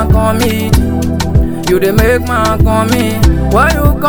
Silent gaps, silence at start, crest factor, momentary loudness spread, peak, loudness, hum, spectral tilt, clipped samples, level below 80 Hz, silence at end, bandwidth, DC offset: none; 0 s; 10 dB; 3 LU; 0 dBFS; -11 LUFS; none; -6 dB/octave; 0.5%; -16 dBFS; 0 s; over 20 kHz; under 0.1%